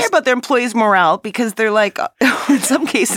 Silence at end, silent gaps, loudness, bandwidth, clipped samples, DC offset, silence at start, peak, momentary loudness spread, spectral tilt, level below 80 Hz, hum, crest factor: 0 s; none; -15 LUFS; 17 kHz; under 0.1%; under 0.1%; 0 s; -2 dBFS; 5 LU; -3 dB/octave; -66 dBFS; none; 14 dB